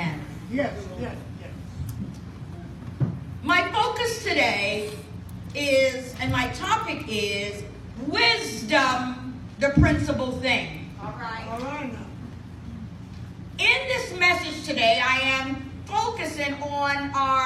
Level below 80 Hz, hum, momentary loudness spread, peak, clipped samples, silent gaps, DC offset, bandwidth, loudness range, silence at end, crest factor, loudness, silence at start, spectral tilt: -44 dBFS; none; 19 LU; -6 dBFS; under 0.1%; none; under 0.1%; 15.5 kHz; 6 LU; 0 s; 20 dB; -24 LUFS; 0 s; -4.5 dB/octave